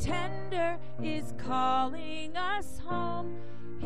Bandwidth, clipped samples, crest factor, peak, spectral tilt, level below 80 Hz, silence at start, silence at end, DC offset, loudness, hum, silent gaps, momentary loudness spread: 13 kHz; under 0.1%; 16 dB; -16 dBFS; -5.5 dB/octave; -50 dBFS; 0 s; 0 s; 3%; -34 LUFS; none; none; 10 LU